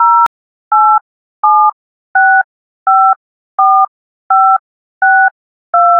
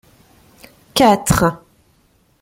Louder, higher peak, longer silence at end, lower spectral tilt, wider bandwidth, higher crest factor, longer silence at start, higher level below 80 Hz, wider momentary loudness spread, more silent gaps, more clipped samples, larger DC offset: first, -10 LUFS vs -15 LUFS; about the same, 0 dBFS vs -2 dBFS; second, 0 s vs 0.85 s; second, -2.5 dB/octave vs -4.5 dB/octave; second, 3.9 kHz vs 16.5 kHz; second, 12 dB vs 18 dB; second, 0 s vs 0.95 s; second, -70 dBFS vs -40 dBFS; second, 7 LU vs 11 LU; first, 0.27-0.71 s, 1.01-1.43 s, 1.73-2.14 s, 2.44-2.86 s, 3.16-3.58 s, 3.88-4.30 s, 4.59-5.01 s, 5.31-5.73 s vs none; neither; neither